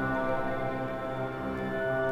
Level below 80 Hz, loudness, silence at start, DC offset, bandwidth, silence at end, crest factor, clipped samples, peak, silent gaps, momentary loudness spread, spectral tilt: -50 dBFS; -32 LUFS; 0 s; under 0.1%; 15 kHz; 0 s; 14 dB; under 0.1%; -18 dBFS; none; 4 LU; -7.5 dB/octave